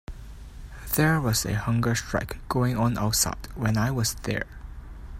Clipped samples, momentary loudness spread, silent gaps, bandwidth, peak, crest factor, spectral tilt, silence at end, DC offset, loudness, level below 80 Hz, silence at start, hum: under 0.1%; 21 LU; none; 16 kHz; -8 dBFS; 18 dB; -4.5 dB/octave; 0 s; under 0.1%; -25 LUFS; -40 dBFS; 0.1 s; none